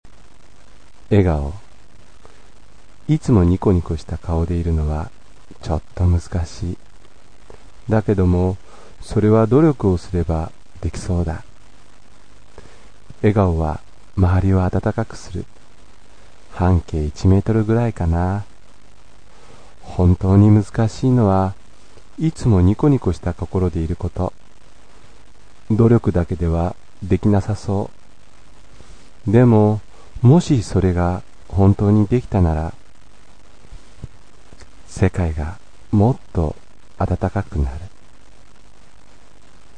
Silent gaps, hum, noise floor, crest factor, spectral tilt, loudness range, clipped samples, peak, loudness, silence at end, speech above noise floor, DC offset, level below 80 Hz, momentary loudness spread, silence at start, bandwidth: none; none; -50 dBFS; 18 dB; -8.5 dB/octave; 7 LU; under 0.1%; -2 dBFS; -18 LUFS; 1.9 s; 33 dB; 2%; -32 dBFS; 16 LU; 1.1 s; 9.6 kHz